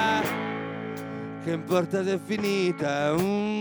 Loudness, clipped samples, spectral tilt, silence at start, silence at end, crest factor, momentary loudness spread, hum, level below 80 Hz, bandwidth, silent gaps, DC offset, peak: -27 LUFS; under 0.1%; -5.5 dB/octave; 0 s; 0 s; 16 dB; 10 LU; none; -62 dBFS; over 20 kHz; none; under 0.1%; -10 dBFS